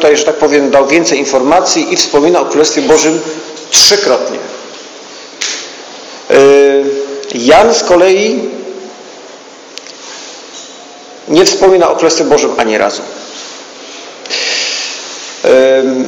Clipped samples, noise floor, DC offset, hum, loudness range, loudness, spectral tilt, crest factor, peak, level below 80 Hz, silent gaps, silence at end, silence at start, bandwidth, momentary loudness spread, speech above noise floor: 1%; -32 dBFS; under 0.1%; none; 6 LU; -9 LUFS; -2 dB/octave; 10 dB; 0 dBFS; -48 dBFS; none; 0 s; 0 s; over 20 kHz; 22 LU; 24 dB